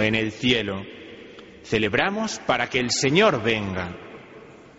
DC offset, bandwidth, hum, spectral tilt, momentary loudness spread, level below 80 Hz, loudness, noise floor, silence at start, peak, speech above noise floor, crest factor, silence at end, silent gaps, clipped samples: under 0.1%; 8 kHz; none; -3 dB/octave; 24 LU; -52 dBFS; -22 LUFS; -45 dBFS; 0 s; -4 dBFS; 22 dB; 20 dB; 0.1 s; none; under 0.1%